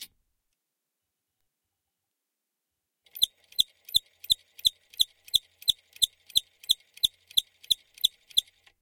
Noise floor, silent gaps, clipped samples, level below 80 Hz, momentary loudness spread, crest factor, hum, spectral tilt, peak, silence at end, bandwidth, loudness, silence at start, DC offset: -85 dBFS; none; under 0.1%; -62 dBFS; 3 LU; 26 dB; none; 2 dB/octave; -6 dBFS; 0.4 s; 17 kHz; -27 LUFS; 0 s; under 0.1%